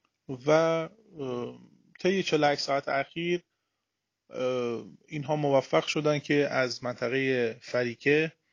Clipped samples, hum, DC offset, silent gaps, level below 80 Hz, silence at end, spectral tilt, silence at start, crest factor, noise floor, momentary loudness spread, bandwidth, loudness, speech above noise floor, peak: under 0.1%; none; under 0.1%; none; -72 dBFS; 0.25 s; -5.5 dB/octave; 0.3 s; 20 dB; -84 dBFS; 13 LU; 9.6 kHz; -28 LUFS; 56 dB; -10 dBFS